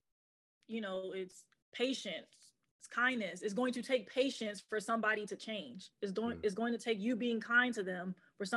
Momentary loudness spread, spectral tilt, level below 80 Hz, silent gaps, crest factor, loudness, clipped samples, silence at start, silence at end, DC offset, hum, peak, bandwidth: 12 LU; -4 dB/octave; -82 dBFS; 1.62-1.72 s, 2.71-2.79 s; 20 dB; -37 LUFS; under 0.1%; 0.7 s; 0 s; under 0.1%; none; -18 dBFS; 12.5 kHz